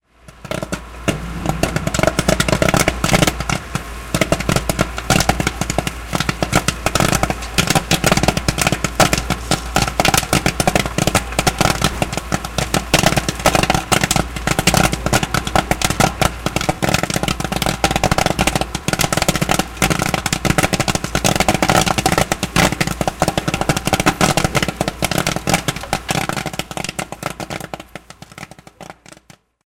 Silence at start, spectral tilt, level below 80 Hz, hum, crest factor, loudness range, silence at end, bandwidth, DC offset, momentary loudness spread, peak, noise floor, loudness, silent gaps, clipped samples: 0.3 s; -3.5 dB/octave; -30 dBFS; none; 18 dB; 3 LU; 0.5 s; 17.5 kHz; under 0.1%; 9 LU; 0 dBFS; -48 dBFS; -17 LUFS; none; under 0.1%